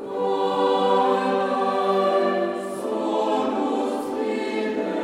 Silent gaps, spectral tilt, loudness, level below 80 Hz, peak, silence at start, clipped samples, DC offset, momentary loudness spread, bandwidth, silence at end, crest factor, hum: none; -5.5 dB/octave; -23 LUFS; -70 dBFS; -8 dBFS; 0 s; under 0.1%; under 0.1%; 7 LU; 13.5 kHz; 0 s; 14 dB; none